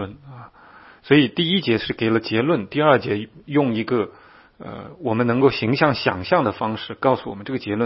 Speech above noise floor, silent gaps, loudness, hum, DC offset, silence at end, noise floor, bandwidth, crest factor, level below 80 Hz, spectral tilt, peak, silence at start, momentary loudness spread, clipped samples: 27 dB; none; -20 LUFS; none; under 0.1%; 0 s; -47 dBFS; 5.8 kHz; 20 dB; -56 dBFS; -10.5 dB/octave; 0 dBFS; 0 s; 12 LU; under 0.1%